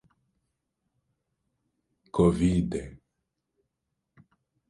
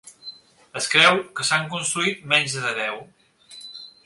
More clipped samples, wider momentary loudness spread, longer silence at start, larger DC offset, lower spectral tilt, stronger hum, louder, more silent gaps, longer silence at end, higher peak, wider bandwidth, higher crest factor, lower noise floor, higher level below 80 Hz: neither; second, 14 LU vs 23 LU; first, 2.15 s vs 0.05 s; neither; first, -8 dB/octave vs -2 dB/octave; neither; second, -26 LUFS vs -20 LUFS; neither; first, 1.75 s vs 0.15 s; second, -10 dBFS vs 0 dBFS; about the same, 11 kHz vs 12 kHz; about the same, 22 dB vs 24 dB; first, -82 dBFS vs -45 dBFS; first, -48 dBFS vs -68 dBFS